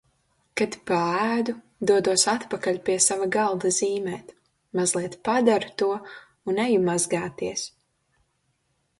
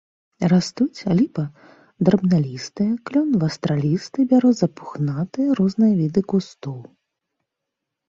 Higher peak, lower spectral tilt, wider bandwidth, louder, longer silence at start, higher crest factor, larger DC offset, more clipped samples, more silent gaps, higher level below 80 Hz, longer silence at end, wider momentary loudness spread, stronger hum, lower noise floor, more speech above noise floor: about the same, -4 dBFS vs -4 dBFS; second, -3 dB/octave vs -7.5 dB/octave; first, 11.5 kHz vs 7.8 kHz; second, -24 LUFS vs -20 LUFS; first, 0.55 s vs 0.4 s; about the same, 20 dB vs 16 dB; neither; neither; neither; second, -66 dBFS vs -58 dBFS; about the same, 1.3 s vs 1.25 s; about the same, 12 LU vs 10 LU; neither; second, -72 dBFS vs -82 dBFS; second, 48 dB vs 62 dB